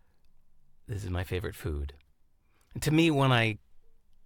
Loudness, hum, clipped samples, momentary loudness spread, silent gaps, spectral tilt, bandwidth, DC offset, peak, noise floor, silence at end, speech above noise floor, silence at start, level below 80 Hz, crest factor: -29 LUFS; none; under 0.1%; 18 LU; none; -6 dB/octave; 17.5 kHz; under 0.1%; -12 dBFS; -64 dBFS; 0.45 s; 36 dB; 0.9 s; -48 dBFS; 20 dB